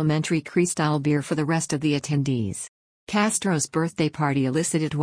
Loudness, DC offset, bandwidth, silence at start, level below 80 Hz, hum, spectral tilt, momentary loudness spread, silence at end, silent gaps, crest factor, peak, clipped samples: -24 LUFS; under 0.1%; 10.5 kHz; 0 s; -58 dBFS; none; -5 dB/octave; 4 LU; 0 s; 2.68-3.07 s; 14 dB; -10 dBFS; under 0.1%